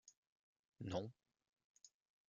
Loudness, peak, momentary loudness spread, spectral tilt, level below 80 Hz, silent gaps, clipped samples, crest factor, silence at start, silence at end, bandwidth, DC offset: -49 LUFS; -30 dBFS; 21 LU; -6 dB/octave; -82 dBFS; 0.17-0.53 s, 0.59-0.72 s, 1.49-1.53 s, 1.64-1.75 s; under 0.1%; 24 dB; 0.05 s; 0.4 s; 7.4 kHz; under 0.1%